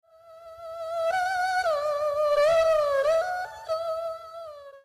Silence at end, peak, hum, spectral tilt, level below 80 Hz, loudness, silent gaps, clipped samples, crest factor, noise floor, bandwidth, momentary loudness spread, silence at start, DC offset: 0.05 s; -16 dBFS; none; -1.5 dB/octave; -60 dBFS; -25 LUFS; none; under 0.1%; 10 dB; -48 dBFS; 14 kHz; 19 LU; 0.25 s; under 0.1%